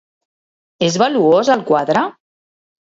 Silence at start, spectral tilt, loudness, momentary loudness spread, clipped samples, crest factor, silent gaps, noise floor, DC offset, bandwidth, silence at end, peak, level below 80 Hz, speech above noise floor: 0.8 s; -5 dB/octave; -15 LUFS; 7 LU; under 0.1%; 16 dB; none; under -90 dBFS; under 0.1%; 8 kHz; 0.8 s; -2 dBFS; -62 dBFS; over 76 dB